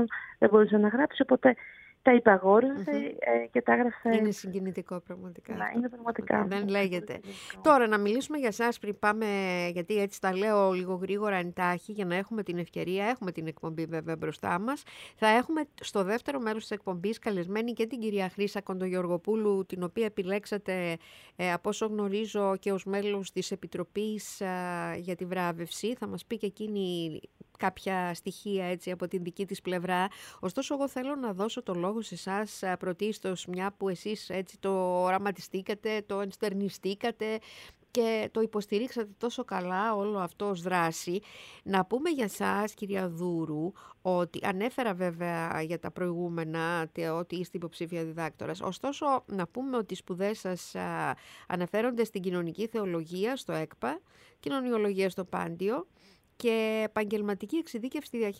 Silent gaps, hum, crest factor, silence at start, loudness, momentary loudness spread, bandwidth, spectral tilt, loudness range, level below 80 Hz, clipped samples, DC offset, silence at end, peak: none; none; 24 dB; 0 s; -31 LUFS; 10 LU; 16 kHz; -5.5 dB/octave; 6 LU; -70 dBFS; under 0.1%; under 0.1%; 0 s; -6 dBFS